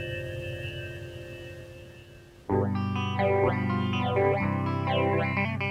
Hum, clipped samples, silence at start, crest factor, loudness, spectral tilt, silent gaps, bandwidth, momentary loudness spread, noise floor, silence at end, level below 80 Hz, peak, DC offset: none; under 0.1%; 0 s; 16 dB; -28 LUFS; -7.5 dB/octave; none; 10 kHz; 18 LU; -50 dBFS; 0 s; -54 dBFS; -12 dBFS; under 0.1%